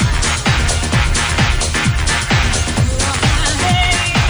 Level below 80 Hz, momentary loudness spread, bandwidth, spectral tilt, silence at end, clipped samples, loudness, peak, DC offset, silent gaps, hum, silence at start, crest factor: -20 dBFS; 2 LU; over 20 kHz; -3.5 dB/octave; 0 s; under 0.1%; -14 LUFS; -2 dBFS; under 0.1%; none; none; 0 s; 12 dB